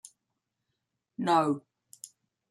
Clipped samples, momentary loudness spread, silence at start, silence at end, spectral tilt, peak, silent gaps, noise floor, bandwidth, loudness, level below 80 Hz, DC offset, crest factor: under 0.1%; 22 LU; 1.2 s; 0.45 s; -5.5 dB/octave; -12 dBFS; none; -84 dBFS; 13.5 kHz; -28 LUFS; -80 dBFS; under 0.1%; 20 dB